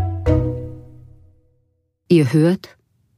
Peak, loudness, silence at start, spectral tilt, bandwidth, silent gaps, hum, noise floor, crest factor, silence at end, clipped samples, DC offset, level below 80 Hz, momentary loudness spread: -2 dBFS; -18 LUFS; 0 s; -8 dB/octave; 14.5 kHz; none; none; -66 dBFS; 18 dB; 0.5 s; under 0.1%; under 0.1%; -34 dBFS; 18 LU